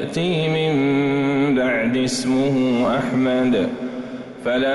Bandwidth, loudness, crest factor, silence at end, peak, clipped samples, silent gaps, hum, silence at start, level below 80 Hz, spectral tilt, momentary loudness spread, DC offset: 11.5 kHz; -19 LUFS; 10 dB; 0 s; -10 dBFS; under 0.1%; none; none; 0 s; -52 dBFS; -5.5 dB/octave; 9 LU; under 0.1%